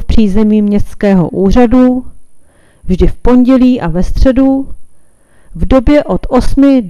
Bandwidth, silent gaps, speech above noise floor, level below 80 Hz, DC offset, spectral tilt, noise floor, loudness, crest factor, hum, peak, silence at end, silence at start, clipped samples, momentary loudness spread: 11.5 kHz; none; 32 dB; -18 dBFS; under 0.1%; -8 dB/octave; -39 dBFS; -10 LUFS; 8 dB; none; 0 dBFS; 0 s; 0 s; 1%; 9 LU